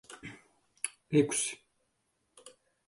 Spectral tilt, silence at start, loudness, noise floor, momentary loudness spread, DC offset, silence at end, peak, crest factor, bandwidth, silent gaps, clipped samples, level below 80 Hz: -4 dB/octave; 0.1 s; -32 LUFS; -78 dBFS; 21 LU; under 0.1%; 0.4 s; -14 dBFS; 22 dB; 11.5 kHz; none; under 0.1%; -74 dBFS